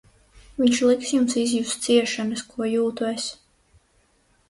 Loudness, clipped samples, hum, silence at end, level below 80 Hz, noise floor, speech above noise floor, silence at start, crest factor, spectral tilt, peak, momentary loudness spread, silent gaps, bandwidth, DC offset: -23 LUFS; under 0.1%; none; 1.15 s; -58 dBFS; -63 dBFS; 41 dB; 0.6 s; 18 dB; -3 dB/octave; -6 dBFS; 9 LU; none; 11.5 kHz; under 0.1%